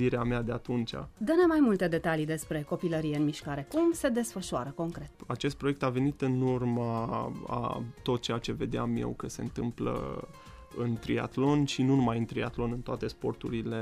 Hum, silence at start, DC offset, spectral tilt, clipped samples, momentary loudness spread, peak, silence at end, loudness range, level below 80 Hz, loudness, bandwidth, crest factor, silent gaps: none; 0 s; under 0.1%; -6.5 dB/octave; under 0.1%; 10 LU; -14 dBFS; 0 s; 5 LU; -50 dBFS; -31 LUFS; 15.5 kHz; 16 dB; none